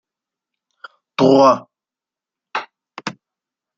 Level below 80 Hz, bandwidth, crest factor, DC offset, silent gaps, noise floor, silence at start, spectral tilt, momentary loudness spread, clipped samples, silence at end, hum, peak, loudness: -64 dBFS; 7.6 kHz; 20 dB; under 0.1%; none; -89 dBFS; 1.2 s; -6 dB/octave; 19 LU; under 0.1%; 0.65 s; none; -2 dBFS; -16 LUFS